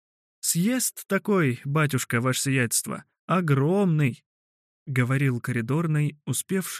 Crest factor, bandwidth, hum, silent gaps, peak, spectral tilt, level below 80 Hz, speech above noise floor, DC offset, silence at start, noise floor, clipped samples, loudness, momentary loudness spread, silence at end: 16 dB; 15 kHz; none; 3.19-3.28 s, 4.26-4.86 s; -8 dBFS; -5 dB/octave; -68 dBFS; over 66 dB; under 0.1%; 0.45 s; under -90 dBFS; under 0.1%; -25 LUFS; 6 LU; 0 s